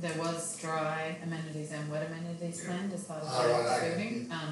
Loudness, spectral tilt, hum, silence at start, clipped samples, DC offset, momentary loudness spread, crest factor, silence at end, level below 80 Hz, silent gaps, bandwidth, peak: -34 LUFS; -4.5 dB/octave; none; 0 s; under 0.1%; under 0.1%; 10 LU; 16 dB; 0 s; -80 dBFS; none; 12 kHz; -18 dBFS